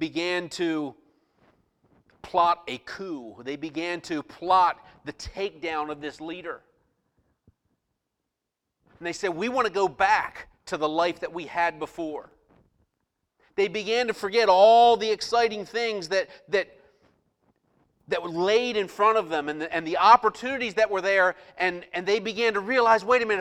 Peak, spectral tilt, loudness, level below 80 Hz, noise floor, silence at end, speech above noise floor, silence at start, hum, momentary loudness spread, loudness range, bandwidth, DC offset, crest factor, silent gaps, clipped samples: -4 dBFS; -3.5 dB/octave; -24 LUFS; -62 dBFS; -84 dBFS; 0 s; 59 dB; 0 s; none; 16 LU; 11 LU; 12.5 kHz; under 0.1%; 22 dB; none; under 0.1%